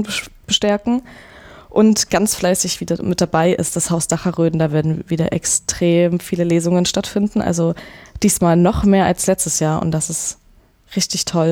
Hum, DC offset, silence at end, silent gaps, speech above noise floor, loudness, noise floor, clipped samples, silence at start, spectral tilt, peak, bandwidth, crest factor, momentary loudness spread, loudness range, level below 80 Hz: none; under 0.1%; 0 s; none; 34 dB; -17 LUFS; -51 dBFS; under 0.1%; 0 s; -4.5 dB/octave; -2 dBFS; 18 kHz; 14 dB; 7 LU; 1 LU; -40 dBFS